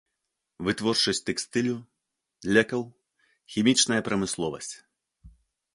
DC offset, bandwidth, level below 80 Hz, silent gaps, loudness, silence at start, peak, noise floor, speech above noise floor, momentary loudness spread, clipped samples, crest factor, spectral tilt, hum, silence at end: under 0.1%; 11.5 kHz; -60 dBFS; none; -26 LUFS; 0.6 s; -6 dBFS; -82 dBFS; 56 dB; 15 LU; under 0.1%; 22 dB; -3 dB/octave; none; 0.45 s